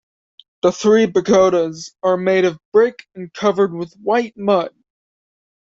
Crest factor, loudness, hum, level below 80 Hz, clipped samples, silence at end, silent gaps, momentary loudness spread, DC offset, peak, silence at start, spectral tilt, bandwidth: 16 dB; -17 LUFS; none; -58 dBFS; under 0.1%; 1.05 s; 2.65-2.72 s; 10 LU; under 0.1%; -2 dBFS; 0.65 s; -5.5 dB/octave; 7.8 kHz